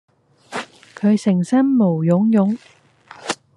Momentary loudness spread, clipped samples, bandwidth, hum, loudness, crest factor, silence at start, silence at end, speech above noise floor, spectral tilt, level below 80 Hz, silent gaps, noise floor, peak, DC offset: 15 LU; under 0.1%; 11 kHz; none; -17 LUFS; 16 dB; 0.5 s; 0.2 s; 28 dB; -7 dB/octave; -68 dBFS; none; -43 dBFS; -2 dBFS; under 0.1%